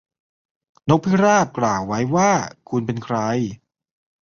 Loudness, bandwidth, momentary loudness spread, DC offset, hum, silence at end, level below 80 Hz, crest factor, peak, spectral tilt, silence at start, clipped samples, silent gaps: -20 LUFS; 7.2 kHz; 10 LU; under 0.1%; none; 0.7 s; -54 dBFS; 18 dB; -2 dBFS; -6 dB/octave; 0.85 s; under 0.1%; none